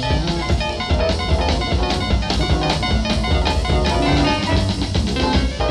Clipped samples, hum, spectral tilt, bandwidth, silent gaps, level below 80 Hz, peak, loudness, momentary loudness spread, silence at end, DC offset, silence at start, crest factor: under 0.1%; none; -5.5 dB/octave; 11 kHz; none; -22 dBFS; -4 dBFS; -19 LUFS; 3 LU; 0 s; under 0.1%; 0 s; 14 dB